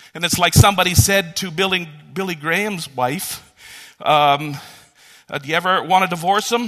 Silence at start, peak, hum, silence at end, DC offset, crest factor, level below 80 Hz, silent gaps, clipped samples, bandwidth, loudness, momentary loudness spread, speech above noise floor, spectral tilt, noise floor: 0.15 s; 0 dBFS; none; 0 s; under 0.1%; 18 dB; -40 dBFS; none; under 0.1%; 14 kHz; -17 LUFS; 16 LU; 31 dB; -3.5 dB/octave; -49 dBFS